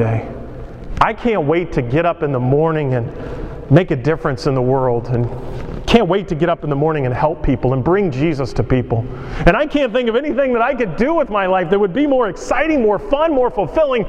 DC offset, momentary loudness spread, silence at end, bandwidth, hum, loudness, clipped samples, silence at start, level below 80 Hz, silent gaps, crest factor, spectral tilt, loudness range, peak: under 0.1%; 9 LU; 0 s; 9.4 kHz; none; -17 LUFS; under 0.1%; 0 s; -30 dBFS; none; 16 dB; -7.5 dB/octave; 2 LU; 0 dBFS